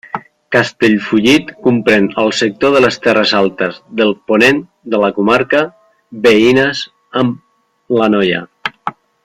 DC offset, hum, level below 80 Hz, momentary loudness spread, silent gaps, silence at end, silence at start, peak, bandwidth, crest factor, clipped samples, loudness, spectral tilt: under 0.1%; none; -50 dBFS; 12 LU; none; 0.35 s; 0.15 s; 0 dBFS; 15 kHz; 14 dB; under 0.1%; -13 LUFS; -5 dB/octave